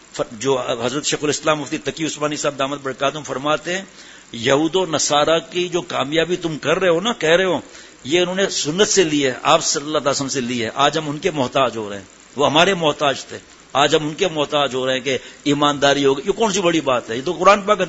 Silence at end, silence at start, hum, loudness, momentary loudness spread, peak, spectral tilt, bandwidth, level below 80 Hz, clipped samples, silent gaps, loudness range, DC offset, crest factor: 0 s; 0.15 s; none; -18 LUFS; 9 LU; 0 dBFS; -3 dB/octave; 8 kHz; -52 dBFS; under 0.1%; none; 4 LU; under 0.1%; 18 dB